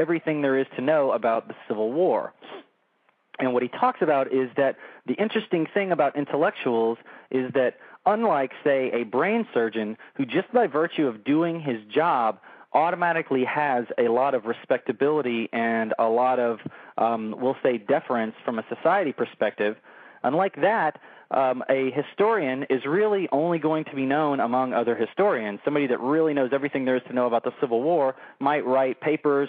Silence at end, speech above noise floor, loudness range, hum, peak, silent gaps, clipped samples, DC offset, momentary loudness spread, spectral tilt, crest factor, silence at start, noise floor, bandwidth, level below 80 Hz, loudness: 0 s; 44 dB; 2 LU; none; -8 dBFS; none; under 0.1%; under 0.1%; 6 LU; -4.5 dB/octave; 16 dB; 0 s; -67 dBFS; 4.8 kHz; under -90 dBFS; -24 LUFS